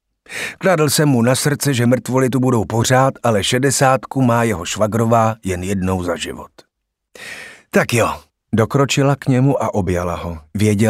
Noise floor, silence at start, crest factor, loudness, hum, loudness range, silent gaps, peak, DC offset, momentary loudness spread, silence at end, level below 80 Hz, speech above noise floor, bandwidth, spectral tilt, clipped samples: -50 dBFS; 0.3 s; 16 dB; -16 LUFS; none; 5 LU; none; 0 dBFS; under 0.1%; 12 LU; 0 s; -46 dBFS; 35 dB; 16 kHz; -5 dB/octave; under 0.1%